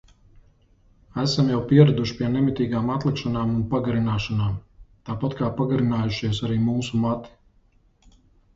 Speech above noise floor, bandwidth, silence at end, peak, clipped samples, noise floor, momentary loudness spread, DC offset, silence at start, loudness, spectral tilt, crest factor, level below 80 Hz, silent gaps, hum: 38 dB; 7.8 kHz; 1.25 s; -2 dBFS; under 0.1%; -59 dBFS; 10 LU; under 0.1%; 1.15 s; -23 LUFS; -7.5 dB/octave; 22 dB; -46 dBFS; none; none